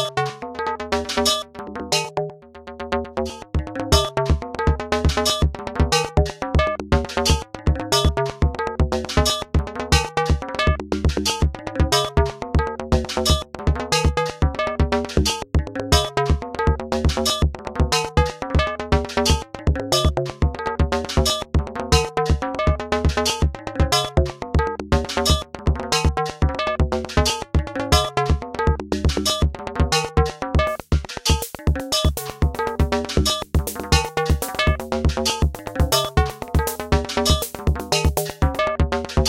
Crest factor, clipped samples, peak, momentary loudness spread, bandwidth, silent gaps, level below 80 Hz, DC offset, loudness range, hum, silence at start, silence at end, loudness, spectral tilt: 18 dB; under 0.1%; -2 dBFS; 5 LU; 16.5 kHz; none; -26 dBFS; under 0.1%; 1 LU; none; 0 s; 0 s; -21 LUFS; -4.5 dB/octave